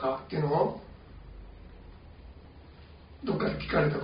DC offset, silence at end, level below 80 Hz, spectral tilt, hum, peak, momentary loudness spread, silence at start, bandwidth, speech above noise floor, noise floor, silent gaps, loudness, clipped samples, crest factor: under 0.1%; 0 s; -50 dBFS; -6 dB/octave; none; -14 dBFS; 24 LU; 0 s; 5.2 kHz; 23 dB; -51 dBFS; none; -30 LUFS; under 0.1%; 20 dB